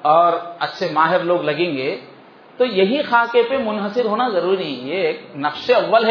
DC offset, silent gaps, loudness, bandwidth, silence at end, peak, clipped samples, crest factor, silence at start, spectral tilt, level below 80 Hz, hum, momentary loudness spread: under 0.1%; none; -18 LUFS; 5.4 kHz; 0 s; -2 dBFS; under 0.1%; 16 dB; 0 s; -6.5 dB/octave; -68 dBFS; none; 9 LU